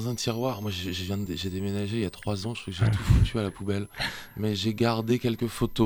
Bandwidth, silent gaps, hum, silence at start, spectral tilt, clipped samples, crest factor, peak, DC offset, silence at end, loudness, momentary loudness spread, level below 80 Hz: 19 kHz; none; none; 0 s; -6 dB/octave; under 0.1%; 20 dB; -8 dBFS; under 0.1%; 0 s; -28 LUFS; 9 LU; -38 dBFS